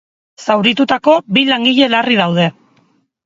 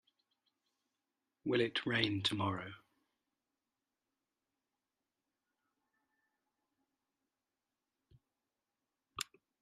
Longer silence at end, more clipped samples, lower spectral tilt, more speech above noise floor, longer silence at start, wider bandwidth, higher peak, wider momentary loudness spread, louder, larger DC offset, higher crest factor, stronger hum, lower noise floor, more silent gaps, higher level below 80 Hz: first, 0.75 s vs 0.4 s; neither; about the same, -5.5 dB/octave vs -4.5 dB/octave; second, 44 dB vs over 54 dB; second, 0.4 s vs 1.45 s; second, 7.8 kHz vs 11.5 kHz; first, 0 dBFS vs -16 dBFS; second, 6 LU vs 12 LU; first, -12 LUFS vs -37 LUFS; neither; second, 14 dB vs 28 dB; neither; second, -56 dBFS vs under -90 dBFS; neither; first, -60 dBFS vs -78 dBFS